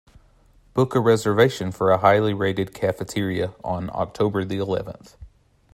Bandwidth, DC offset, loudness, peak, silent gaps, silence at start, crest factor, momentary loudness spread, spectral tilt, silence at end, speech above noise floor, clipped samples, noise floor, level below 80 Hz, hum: 16 kHz; under 0.1%; -22 LUFS; -2 dBFS; none; 0.75 s; 20 dB; 11 LU; -6.5 dB/octave; 0.5 s; 34 dB; under 0.1%; -55 dBFS; -52 dBFS; none